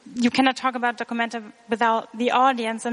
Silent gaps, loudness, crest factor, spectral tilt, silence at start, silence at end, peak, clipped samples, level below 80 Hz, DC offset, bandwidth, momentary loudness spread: none; -22 LUFS; 18 dB; -3.5 dB/octave; 0.05 s; 0 s; -4 dBFS; under 0.1%; -70 dBFS; under 0.1%; 10.5 kHz; 8 LU